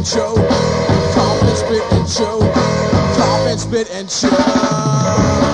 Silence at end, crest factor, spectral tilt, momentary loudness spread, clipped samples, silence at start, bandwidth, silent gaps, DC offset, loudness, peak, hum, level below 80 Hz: 0 s; 14 dB; -5.5 dB/octave; 4 LU; under 0.1%; 0 s; 10 kHz; none; under 0.1%; -14 LUFS; 0 dBFS; none; -32 dBFS